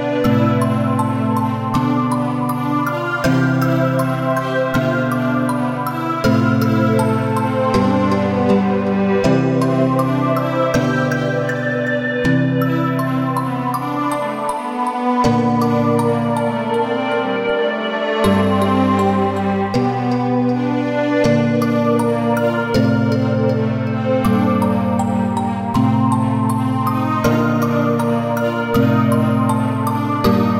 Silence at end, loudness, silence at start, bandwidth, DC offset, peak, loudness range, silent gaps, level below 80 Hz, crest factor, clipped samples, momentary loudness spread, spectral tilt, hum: 0 s; -17 LUFS; 0 s; 16.5 kHz; under 0.1%; -2 dBFS; 2 LU; none; -44 dBFS; 14 dB; under 0.1%; 4 LU; -7.5 dB/octave; none